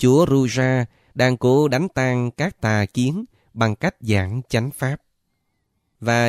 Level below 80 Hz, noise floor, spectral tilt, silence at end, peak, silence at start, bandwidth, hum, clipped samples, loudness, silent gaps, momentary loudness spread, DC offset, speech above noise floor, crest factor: -50 dBFS; -71 dBFS; -6.5 dB/octave; 0 s; -4 dBFS; 0 s; 14.5 kHz; none; under 0.1%; -20 LUFS; none; 10 LU; under 0.1%; 52 dB; 16 dB